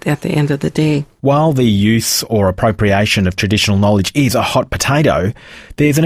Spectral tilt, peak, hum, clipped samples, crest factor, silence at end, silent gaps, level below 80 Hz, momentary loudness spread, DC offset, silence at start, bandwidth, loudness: -5 dB/octave; 0 dBFS; none; under 0.1%; 12 dB; 0 s; none; -36 dBFS; 4 LU; under 0.1%; 0.05 s; 16 kHz; -14 LUFS